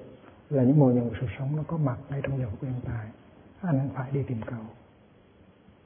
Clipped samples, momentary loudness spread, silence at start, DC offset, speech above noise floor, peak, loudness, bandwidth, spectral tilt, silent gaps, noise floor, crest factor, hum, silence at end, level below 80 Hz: under 0.1%; 16 LU; 0 s; under 0.1%; 30 dB; -10 dBFS; -28 LUFS; 3.6 kHz; -13 dB/octave; none; -57 dBFS; 20 dB; none; 1.1 s; -56 dBFS